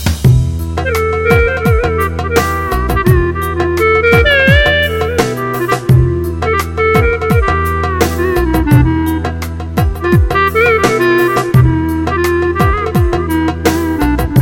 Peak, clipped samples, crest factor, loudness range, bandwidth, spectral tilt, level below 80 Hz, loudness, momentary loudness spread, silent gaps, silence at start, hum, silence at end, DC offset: 0 dBFS; under 0.1%; 12 dB; 2 LU; 17.5 kHz; -6.5 dB/octave; -20 dBFS; -12 LUFS; 7 LU; none; 0 s; none; 0 s; under 0.1%